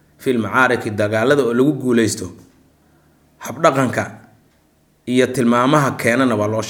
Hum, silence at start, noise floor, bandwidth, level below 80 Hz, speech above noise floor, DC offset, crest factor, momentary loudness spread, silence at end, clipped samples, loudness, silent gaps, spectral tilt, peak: none; 0.2 s; -57 dBFS; 18 kHz; -60 dBFS; 41 dB; under 0.1%; 18 dB; 12 LU; 0 s; under 0.1%; -17 LUFS; none; -5.5 dB/octave; 0 dBFS